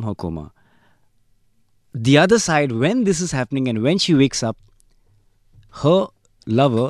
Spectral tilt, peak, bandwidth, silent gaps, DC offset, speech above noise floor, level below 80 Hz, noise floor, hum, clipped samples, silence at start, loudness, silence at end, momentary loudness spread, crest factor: -5 dB/octave; -2 dBFS; 12.5 kHz; none; under 0.1%; 41 dB; -50 dBFS; -59 dBFS; none; under 0.1%; 0 s; -18 LUFS; 0 s; 15 LU; 18 dB